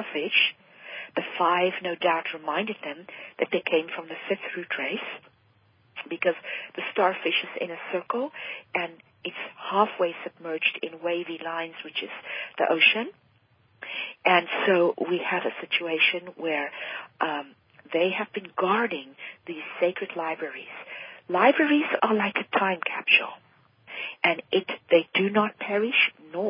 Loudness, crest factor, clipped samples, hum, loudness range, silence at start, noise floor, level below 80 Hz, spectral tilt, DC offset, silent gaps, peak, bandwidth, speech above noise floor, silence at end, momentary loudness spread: -26 LUFS; 22 dB; under 0.1%; none; 6 LU; 0 s; -63 dBFS; -82 dBFS; -8.5 dB/octave; under 0.1%; none; -4 dBFS; 5.2 kHz; 36 dB; 0 s; 16 LU